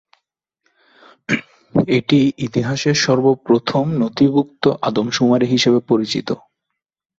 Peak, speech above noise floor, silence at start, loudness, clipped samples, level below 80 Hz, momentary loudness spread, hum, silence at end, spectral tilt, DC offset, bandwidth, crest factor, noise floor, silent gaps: -2 dBFS; 63 dB; 1.3 s; -17 LUFS; under 0.1%; -56 dBFS; 8 LU; none; 0.8 s; -5.5 dB/octave; under 0.1%; 7.8 kHz; 16 dB; -79 dBFS; none